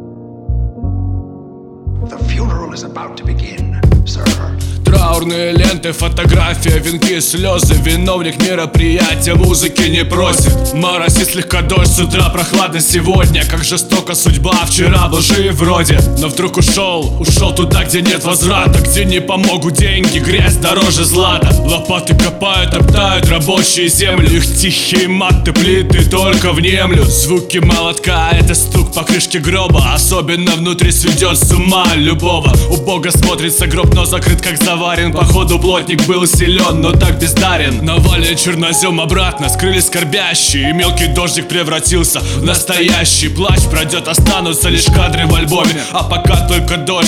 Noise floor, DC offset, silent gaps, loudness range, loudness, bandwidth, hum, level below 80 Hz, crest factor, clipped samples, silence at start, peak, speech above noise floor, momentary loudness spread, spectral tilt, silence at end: -31 dBFS; under 0.1%; none; 2 LU; -11 LUFS; 18.5 kHz; none; -18 dBFS; 10 dB; under 0.1%; 0 s; 0 dBFS; 21 dB; 5 LU; -4 dB/octave; 0 s